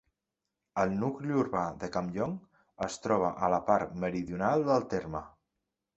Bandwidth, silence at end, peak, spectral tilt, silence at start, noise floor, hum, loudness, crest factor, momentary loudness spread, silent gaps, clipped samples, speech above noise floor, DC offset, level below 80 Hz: 8.4 kHz; 0.7 s; -12 dBFS; -6.5 dB/octave; 0.75 s; -87 dBFS; none; -31 LUFS; 20 dB; 10 LU; none; under 0.1%; 57 dB; under 0.1%; -60 dBFS